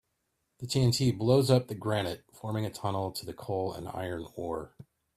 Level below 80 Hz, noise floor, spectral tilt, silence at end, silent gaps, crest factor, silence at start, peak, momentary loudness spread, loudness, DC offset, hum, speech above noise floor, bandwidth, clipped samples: -60 dBFS; -79 dBFS; -6 dB/octave; 0.35 s; none; 22 dB; 0.6 s; -10 dBFS; 13 LU; -31 LUFS; under 0.1%; none; 49 dB; 15.5 kHz; under 0.1%